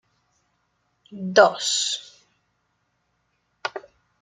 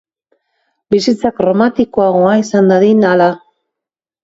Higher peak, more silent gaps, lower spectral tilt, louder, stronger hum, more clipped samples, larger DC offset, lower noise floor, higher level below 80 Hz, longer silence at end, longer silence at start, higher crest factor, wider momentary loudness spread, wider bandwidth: about the same, -2 dBFS vs 0 dBFS; neither; second, -2 dB/octave vs -6.5 dB/octave; second, -21 LUFS vs -11 LUFS; neither; neither; neither; second, -72 dBFS vs -84 dBFS; second, -76 dBFS vs -50 dBFS; second, 0.45 s vs 0.85 s; first, 1.1 s vs 0.9 s; first, 24 dB vs 12 dB; first, 17 LU vs 5 LU; first, 11 kHz vs 7.8 kHz